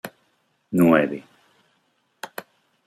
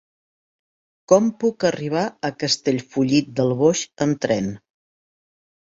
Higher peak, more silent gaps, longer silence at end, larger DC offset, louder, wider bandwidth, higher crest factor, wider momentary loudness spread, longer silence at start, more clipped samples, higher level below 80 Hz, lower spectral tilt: about the same, -2 dBFS vs -2 dBFS; neither; second, 0.45 s vs 1.1 s; neither; about the same, -20 LUFS vs -21 LUFS; first, 16 kHz vs 8 kHz; about the same, 22 dB vs 20 dB; first, 23 LU vs 7 LU; second, 0.05 s vs 1.1 s; neither; second, -66 dBFS vs -60 dBFS; first, -7 dB/octave vs -5 dB/octave